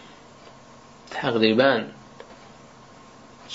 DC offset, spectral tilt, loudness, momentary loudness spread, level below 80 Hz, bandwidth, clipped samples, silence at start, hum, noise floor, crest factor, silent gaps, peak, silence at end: under 0.1%; -5.5 dB/octave; -22 LUFS; 27 LU; -64 dBFS; 7.8 kHz; under 0.1%; 1.1 s; none; -48 dBFS; 24 dB; none; -4 dBFS; 0 s